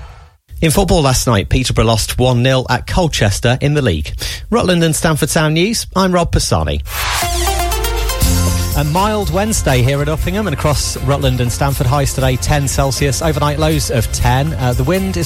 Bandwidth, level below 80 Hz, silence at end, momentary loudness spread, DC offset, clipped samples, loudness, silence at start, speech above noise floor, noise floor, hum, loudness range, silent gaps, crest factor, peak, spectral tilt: 16.5 kHz; -22 dBFS; 0 s; 4 LU; under 0.1%; under 0.1%; -14 LUFS; 0 s; 23 dB; -37 dBFS; none; 2 LU; none; 14 dB; 0 dBFS; -4.5 dB/octave